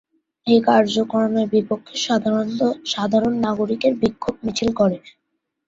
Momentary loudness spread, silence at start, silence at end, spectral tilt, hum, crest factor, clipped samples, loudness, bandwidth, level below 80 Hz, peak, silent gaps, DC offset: 7 LU; 0.45 s; 0.6 s; -5 dB/octave; none; 18 dB; under 0.1%; -20 LUFS; 7.8 kHz; -54 dBFS; -2 dBFS; none; under 0.1%